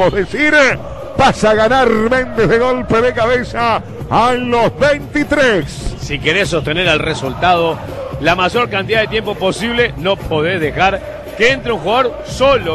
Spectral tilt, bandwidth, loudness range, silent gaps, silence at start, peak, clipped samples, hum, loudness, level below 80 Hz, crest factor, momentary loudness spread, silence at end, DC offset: -5 dB/octave; 13.5 kHz; 3 LU; none; 0 s; 0 dBFS; under 0.1%; none; -14 LUFS; -32 dBFS; 14 dB; 7 LU; 0 s; under 0.1%